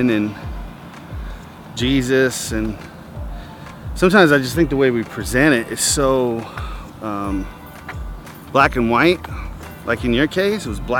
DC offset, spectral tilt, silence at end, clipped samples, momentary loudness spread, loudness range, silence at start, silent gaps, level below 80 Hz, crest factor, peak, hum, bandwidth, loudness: under 0.1%; -4.5 dB/octave; 0 s; under 0.1%; 19 LU; 6 LU; 0 s; none; -34 dBFS; 20 dB; 0 dBFS; none; 19 kHz; -17 LUFS